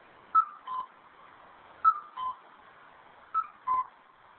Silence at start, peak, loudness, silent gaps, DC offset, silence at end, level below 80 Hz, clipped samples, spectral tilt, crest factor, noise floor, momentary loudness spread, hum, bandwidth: 0.35 s; -12 dBFS; -31 LUFS; none; under 0.1%; 0.5 s; -76 dBFS; under 0.1%; 0 dB/octave; 20 dB; -57 dBFS; 14 LU; none; 4.3 kHz